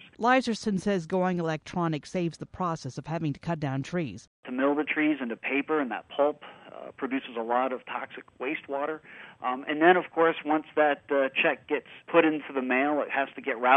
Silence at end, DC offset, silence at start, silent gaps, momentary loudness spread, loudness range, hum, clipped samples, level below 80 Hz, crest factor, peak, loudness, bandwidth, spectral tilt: 0 s; under 0.1%; 0.05 s; 4.27-4.43 s; 12 LU; 6 LU; none; under 0.1%; -66 dBFS; 22 dB; -6 dBFS; -28 LUFS; 10.5 kHz; -6 dB/octave